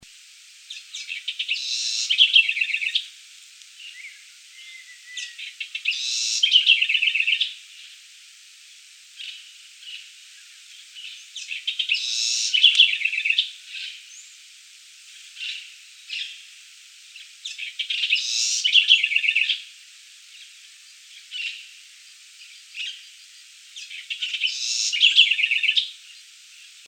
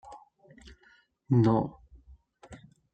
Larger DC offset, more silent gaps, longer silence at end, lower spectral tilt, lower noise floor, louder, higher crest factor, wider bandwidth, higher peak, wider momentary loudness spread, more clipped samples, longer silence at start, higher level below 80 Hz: neither; neither; second, 0.05 s vs 0.4 s; second, 8 dB/octave vs -9.5 dB/octave; second, -48 dBFS vs -64 dBFS; first, -19 LUFS vs -27 LUFS; first, 24 dB vs 18 dB; first, 17 kHz vs 8.4 kHz; first, -2 dBFS vs -14 dBFS; about the same, 26 LU vs 28 LU; neither; first, 0.7 s vs 0.1 s; second, -88 dBFS vs -58 dBFS